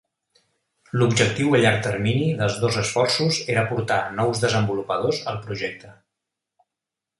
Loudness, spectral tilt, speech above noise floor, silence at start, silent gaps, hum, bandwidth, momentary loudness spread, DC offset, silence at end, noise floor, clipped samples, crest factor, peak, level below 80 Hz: -22 LUFS; -5 dB/octave; 64 dB; 0.95 s; none; none; 11.5 kHz; 11 LU; under 0.1%; 1.25 s; -86 dBFS; under 0.1%; 20 dB; -2 dBFS; -54 dBFS